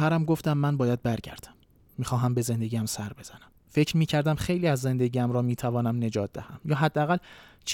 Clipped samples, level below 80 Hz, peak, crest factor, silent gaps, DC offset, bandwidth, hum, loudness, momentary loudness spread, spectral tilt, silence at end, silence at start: under 0.1%; -54 dBFS; -12 dBFS; 16 dB; none; under 0.1%; 17.5 kHz; none; -27 LUFS; 13 LU; -6 dB/octave; 0 s; 0 s